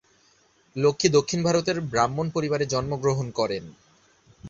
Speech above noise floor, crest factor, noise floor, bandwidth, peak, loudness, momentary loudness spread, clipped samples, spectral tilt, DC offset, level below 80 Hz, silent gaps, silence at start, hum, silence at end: 38 dB; 22 dB; -62 dBFS; 7.8 kHz; -4 dBFS; -24 LUFS; 7 LU; under 0.1%; -5 dB/octave; under 0.1%; -54 dBFS; none; 0.75 s; none; 0 s